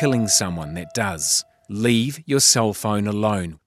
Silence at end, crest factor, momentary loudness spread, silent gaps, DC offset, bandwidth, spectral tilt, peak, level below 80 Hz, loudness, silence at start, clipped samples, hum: 0.1 s; 18 dB; 12 LU; none; under 0.1%; 15.5 kHz; -3.5 dB/octave; -2 dBFS; -52 dBFS; -19 LUFS; 0 s; under 0.1%; none